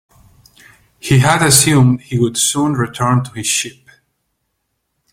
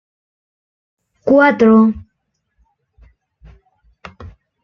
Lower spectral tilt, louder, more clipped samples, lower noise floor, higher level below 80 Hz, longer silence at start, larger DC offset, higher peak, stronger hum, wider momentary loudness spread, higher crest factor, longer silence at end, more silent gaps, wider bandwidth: second, -4 dB/octave vs -8 dB/octave; about the same, -13 LUFS vs -12 LUFS; neither; about the same, -70 dBFS vs -71 dBFS; about the same, -46 dBFS vs -48 dBFS; second, 1.05 s vs 1.25 s; neither; about the same, 0 dBFS vs -2 dBFS; neither; second, 8 LU vs 26 LU; about the same, 16 dB vs 16 dB; first, 1.4 s vs 0.35 s; neither; first, 16.5 kHz vs 6.2 kHz